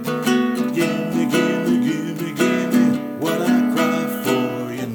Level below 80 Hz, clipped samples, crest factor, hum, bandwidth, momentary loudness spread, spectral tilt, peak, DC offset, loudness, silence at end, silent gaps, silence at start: -62 dBFS; under 0.1%; 14 dB; none; over 20 kHz; 5 LU; -5.5 dB/octave; -4 dBFS; under 0.1%; -19 LUFS; 0 s; none; 0 s